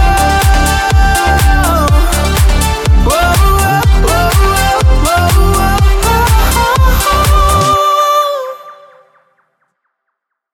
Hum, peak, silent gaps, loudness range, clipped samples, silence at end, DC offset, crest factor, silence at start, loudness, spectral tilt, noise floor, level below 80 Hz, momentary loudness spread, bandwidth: none; 0 dBFS; none; 2 LU; under 0.1%; 1.8 s; under 0.1%; 10 dB; 0 s; -10 LUFS; -4.5 dB/octave; -72 dBFS; -12 dBFS; 2 LU; 17.5 kHz